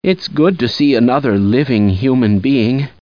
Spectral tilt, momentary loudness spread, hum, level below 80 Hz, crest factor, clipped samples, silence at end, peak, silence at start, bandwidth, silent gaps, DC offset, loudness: -8 dB/octave; 2 LU; none; -46 dBFS; 12 dB; under 0.1%; 0.15 s; 0 dBFS; 0.05 s; 5.2 kHz; none; 0.4%; -13 LUFS